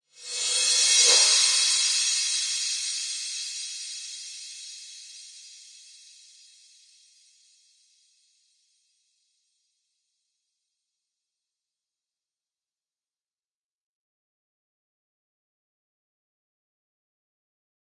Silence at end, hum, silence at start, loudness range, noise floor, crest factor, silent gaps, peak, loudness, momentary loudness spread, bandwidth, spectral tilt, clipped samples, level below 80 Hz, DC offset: 12.25 s; none; 0.2 s; 24 LU; under -90 dBFS; 26 dB; none; -6 dBFS; -21 LUFS; 25 LU; 11.5 kHz; 6 dB/octave; under 0.1%; under -90 dBFS; under 0.1%